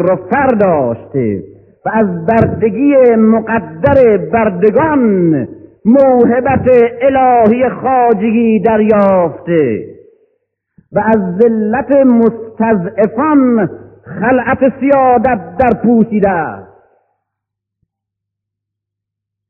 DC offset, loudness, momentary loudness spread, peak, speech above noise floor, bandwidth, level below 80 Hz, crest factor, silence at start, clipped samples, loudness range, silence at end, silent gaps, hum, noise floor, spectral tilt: under 0.1%; -11 LUFS; 8 LU; 0 dBFS; 69 dB; 3.4 kHz; -42 dBFS; 12 dB; 0 s; 0.1%; 4 LU; 2.85 s; none; none; -79 dBFS; -11 dB/octave